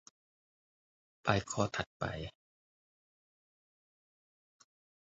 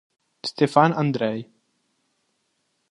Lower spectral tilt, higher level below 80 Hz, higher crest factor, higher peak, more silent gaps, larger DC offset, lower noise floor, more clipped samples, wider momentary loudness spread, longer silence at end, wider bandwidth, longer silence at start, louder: second, -4.5 dB/octave vs -6.5 dB/octave; first, -62 dBFS vs -70 dBFS; first, 32 dB vs 24 dB; second, -10 dBFS vs -2 dBFS; first, 1.86-2.00 s vs none; neither; first, under -90 dBFS vs -72 dBFS; neither; second, 11 LU vs 15 LU; first, 2.75 s vs 1.45 s; second, 7.6 kHz vs 11.5 kHz; first, 1.25 s vs 0.45 s; second, -36 LUFS vs -22 LUFS